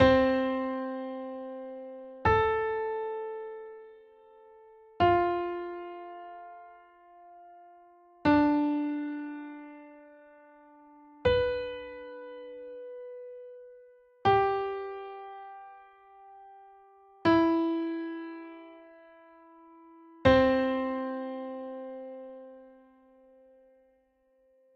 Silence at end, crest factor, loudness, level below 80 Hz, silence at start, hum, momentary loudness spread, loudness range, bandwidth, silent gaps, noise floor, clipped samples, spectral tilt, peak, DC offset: 2.05 s; 22 dB; -29 LUFS; -54 dBFS; 0 s; none; 23 LU; 5 LU; 6.8 kHz; none; -69 dBFS; under 0.1%; -8 dB/octave; -10 dBFS; under 0.1%